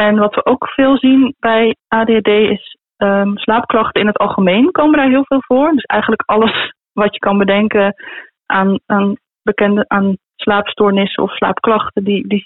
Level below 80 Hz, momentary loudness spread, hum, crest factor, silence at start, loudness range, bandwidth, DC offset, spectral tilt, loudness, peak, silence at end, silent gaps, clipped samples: -48 dBFS; 7 LU; none; 10 dB; 0 s; 2 LU; 4.1 kHz; 0.2%; -11 dB/octave; -13 LUFS; -2 dBFS; 0.05 s; none; under 0.1%